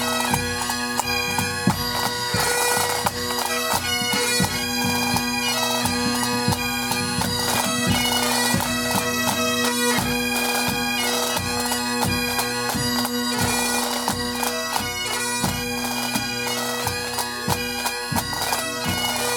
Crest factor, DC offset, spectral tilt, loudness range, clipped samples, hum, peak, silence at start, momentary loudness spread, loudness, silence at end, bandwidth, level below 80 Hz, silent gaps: 20 dB; under 0.1%; -2.5 dB/octave; 3 LU; under 0.1%; none; -4 dBFS; 0 s; 4 LU; -21 LUFS; 0 s; over 20 kHz; -46 dBFS; none